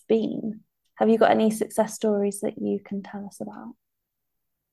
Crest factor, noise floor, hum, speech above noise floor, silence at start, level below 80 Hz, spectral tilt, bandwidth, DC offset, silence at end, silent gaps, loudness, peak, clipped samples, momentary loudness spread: 20 dB; -82 dBFS; none; 58 dB; 0.1 s; -72 dBFS; -5.5 dB/octave; 12.5 kHz; under 0.1%; 1 s; none; -24 LUFS; -6 dBFS; under 0.1%; 19 LU